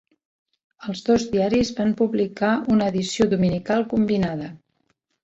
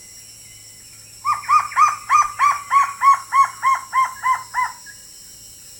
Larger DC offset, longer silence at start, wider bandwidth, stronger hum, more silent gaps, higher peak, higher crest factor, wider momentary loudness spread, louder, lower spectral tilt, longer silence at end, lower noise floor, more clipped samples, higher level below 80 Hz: neither; first, 0.8 s vs 0.15 s; second, 8 kHz vs 18 kHz; neither; neither; about the same, -6 dBFS vs -4 dBFS; about the same, 16 dB vs 16 dB; second, 9 LU vs 24 LU; second, -21 LUFS vs -18 LUFS; first, -6 dB/octave vs 0.5 dB/octave; first, 0.7 s vs 0.05 s; first, -70 dBFS vs -42 dBFS; neither; first, -50 dBFS vs -58 dBFS